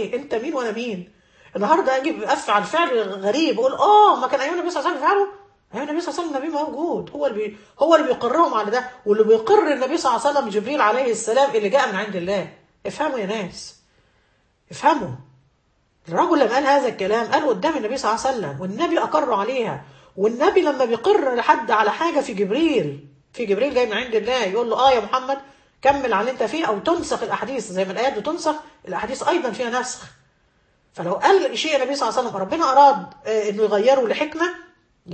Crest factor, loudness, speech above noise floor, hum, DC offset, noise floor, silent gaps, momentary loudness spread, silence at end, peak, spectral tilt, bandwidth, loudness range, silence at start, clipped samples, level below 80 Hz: 18 dB; -20 LUFS; 44 dB; none; under 0.1%; -64 dBFS; none; 11 LU; 0 s; -2 dBFS; -4 dB/octave; 8.8 kHz; 6 LU; 0 s; under 0.1%; -60 dBFS